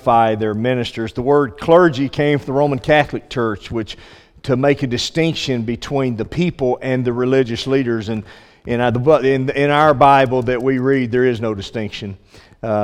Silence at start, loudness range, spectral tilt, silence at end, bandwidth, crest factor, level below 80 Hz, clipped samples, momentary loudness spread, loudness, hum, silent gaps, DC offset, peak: 0.05 s; 5 LU; -6.5 dB/octave; 0 s; 13 kHz; 16 dB; -44 dBFS; under 0.1%; 13 LU; -17 LUFS; none; none; under 0.1%; 0 dBFS